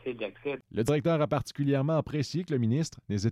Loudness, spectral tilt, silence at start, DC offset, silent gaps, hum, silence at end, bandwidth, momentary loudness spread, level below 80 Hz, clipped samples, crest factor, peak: -30 LUFS; -7 dB/octave; 0.05 s; under 0.1%; none; none; 0 s; 14 kHz; 9 LU; -58 dBFS; under 0.1%; 14 dB; -14 dBFS